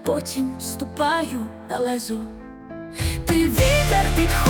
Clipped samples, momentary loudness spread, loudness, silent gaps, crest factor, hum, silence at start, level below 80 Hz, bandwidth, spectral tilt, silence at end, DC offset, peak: under 0.1%; 17 LU; -22 LUFS; none; 16 dB; none; 0 s; -30 dBFS; 19.5 kHz; -4.5 dB/octave; 0 s; under 0.1%; -6 dBFS